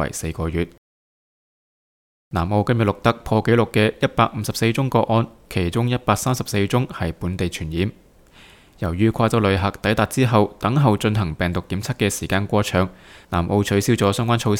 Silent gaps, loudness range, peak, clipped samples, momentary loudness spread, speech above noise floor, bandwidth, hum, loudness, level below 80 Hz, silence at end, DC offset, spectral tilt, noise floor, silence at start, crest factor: 0.78-2.31 s; 4 LU; 0 dBFS; under 0.1%; 8 LU; 29 dB; 17.5 kHz; none; -21 LUFS; -42 dBFS; 0 s; under 0.1%; -6 dB/octave; -48 dBFS; 0 s; 20 dB